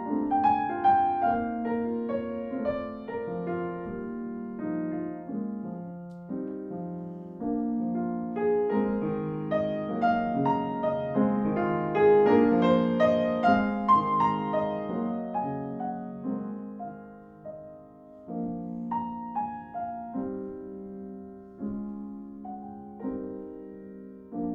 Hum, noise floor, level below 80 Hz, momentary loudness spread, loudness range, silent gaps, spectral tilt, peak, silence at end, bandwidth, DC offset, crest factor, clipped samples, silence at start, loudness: none; -49 dBFS; -60 dBFS; 18 LU; 14 LU; none; -9 dB/octave; -10 dBFS; 0 s; 6.2 kHz; under 0.1%; 18 dB; under 0.1%; 0 s; -28 LUFS